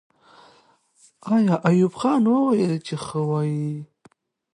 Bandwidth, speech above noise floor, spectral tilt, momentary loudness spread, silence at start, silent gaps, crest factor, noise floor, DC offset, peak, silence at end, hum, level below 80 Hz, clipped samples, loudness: 11 kHz; 38 dB; -7.5 dB/octave; 10 LU; 1.25 s; none; 16 dB; -59 dBFS; under 0.1%; -6 dBFS; 0.7 s; none; -66 dBFS; under 0.1%; -21 LUFS